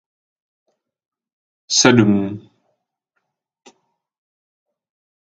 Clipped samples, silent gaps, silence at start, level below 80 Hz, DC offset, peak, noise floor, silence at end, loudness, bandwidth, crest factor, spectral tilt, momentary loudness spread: under 0.1%; none; 1.7 s; -56 dBFS; under 0.1%; 0 dBFS; -75 dBFS; 2.85 s; -15 LUFS; 10 kHz; 22 dB; -4 dB/octave; 17 LU